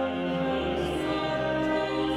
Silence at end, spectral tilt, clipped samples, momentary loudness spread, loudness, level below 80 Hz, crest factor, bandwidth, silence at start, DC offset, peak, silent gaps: 0 s; -6 dB/octave; under 0.1%; 2 LU; -28 LUFS; -46 dBFS; 12 dB; 13.5 kHz; 0 s; under 0.1%; -16 dBFS; none